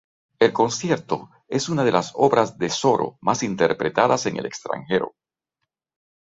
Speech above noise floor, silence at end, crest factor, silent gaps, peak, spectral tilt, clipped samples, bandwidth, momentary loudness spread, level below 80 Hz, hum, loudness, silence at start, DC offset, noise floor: 60 dB; 1.2 s; 20 dB; none; -2 dBFS; -4.5 dB/octave; under 0.1%; 7.8 kHz; 10 LU; -60 dBFS; none; -22 LUFS; 0.4 s; under 0.1%; -81 dBFS